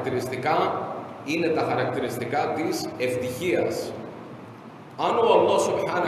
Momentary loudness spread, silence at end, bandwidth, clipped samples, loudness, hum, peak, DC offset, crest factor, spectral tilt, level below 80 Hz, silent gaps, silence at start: 20 LU; 0 s; 13 kHz; under 0.1%; -25 LUFS; none; -8 dBFS; under 0.1%; 18 dB; -5 dB/octave; -64 dBFS; none; 0 s